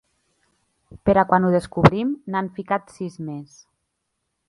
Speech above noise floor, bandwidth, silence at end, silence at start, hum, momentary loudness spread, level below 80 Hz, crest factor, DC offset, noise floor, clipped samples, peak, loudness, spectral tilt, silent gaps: 56 dB; 11.5 kHz; 1.05 s; 1.05 s; none; 16 LU; -48 dBFS; 22 dB; under 0.1%; -76 dBFS; under 0.1%; 0 dBFS; -21 LUFS; -8 dB/octave; none